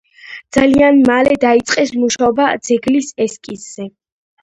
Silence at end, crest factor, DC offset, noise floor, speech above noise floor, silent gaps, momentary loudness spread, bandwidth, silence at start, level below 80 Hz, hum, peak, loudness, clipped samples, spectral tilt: 0.55 s; 14 dB; under 0.1%; -36 dBFS; 23 dB; none; 19 LU; 11 kHz; 0.25 s; -46 dBFS; none; 0 dBFS; -13 LUFS; under 0.1%; -4 dB/octave